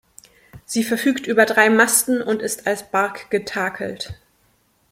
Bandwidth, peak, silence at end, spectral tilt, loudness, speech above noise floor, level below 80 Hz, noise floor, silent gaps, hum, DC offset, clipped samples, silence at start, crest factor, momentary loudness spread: 16.5 kHz; 0 dBFS; 0.8 s; -3 dB/octave; -19 LUFS; 42 dB; -58 dBFS; -62 dBFS; none; none; under 0.1%; under 0.1%; 0.55 s; 20 dB; 13 LU